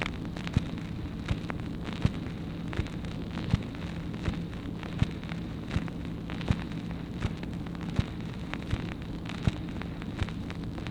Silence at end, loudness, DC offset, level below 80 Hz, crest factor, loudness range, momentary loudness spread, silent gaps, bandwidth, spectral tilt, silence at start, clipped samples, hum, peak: 0 s; -35 LUFS; under 0.1%; -42 dBFS; 22 dB; 1 LU; 5 LU; none; 12 kHz; -7 dB/octave; 0 s; under 0.1%; none; -10 dBFS